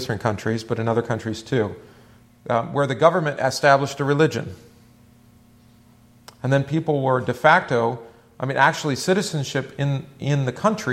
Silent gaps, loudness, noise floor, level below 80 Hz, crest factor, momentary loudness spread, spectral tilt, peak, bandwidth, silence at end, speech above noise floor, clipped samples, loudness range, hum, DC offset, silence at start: none; -21 LUFS; -52 dBFS; -58 dBFS; 22 dB; 10 LU; -5.5 dB/octave; 0 dBFS; 14.5 kHz; 0 s; 31 dB; under 0.1%; 4 LU; none; under 0.1%; 0 s